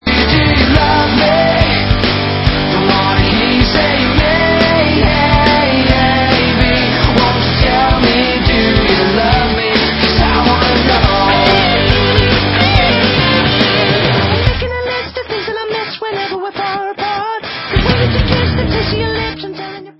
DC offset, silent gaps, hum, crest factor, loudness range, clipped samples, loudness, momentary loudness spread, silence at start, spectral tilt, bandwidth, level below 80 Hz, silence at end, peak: under 0.1%; none; none; 12 dB; 6 LU; under 0.1%; -11 LUFS; 9 LU; 0.05 s; -7.5 dB/octave; 8 kHz; -20 dBFS; 0.1 s; 0 dBFS